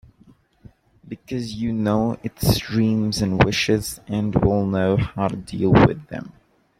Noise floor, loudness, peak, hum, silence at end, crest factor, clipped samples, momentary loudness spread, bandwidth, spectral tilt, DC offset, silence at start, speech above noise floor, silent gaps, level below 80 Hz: -54 dBFS; -21 LUFS; -2 dBFS; none; 0.5 s; 20 dB; under 0.1%; 13 LU; 16.5 kHz; -6 dB/octave; under 0.1%; 1.05 s; 34 dB; none; -40 dBFS